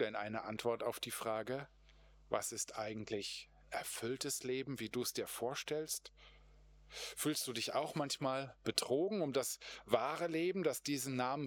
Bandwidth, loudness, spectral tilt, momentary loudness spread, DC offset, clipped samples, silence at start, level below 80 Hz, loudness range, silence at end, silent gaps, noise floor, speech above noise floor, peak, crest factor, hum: over 20 kHz; -40 LUFS; -3.5 dB/octave; 8 LU; under 0.1%; under 0.1%; 0 s; -70 dBFS; 4 LU; 0 s; none; -64 dBFS; 24 dB; -16 dBFS; 24 dB; none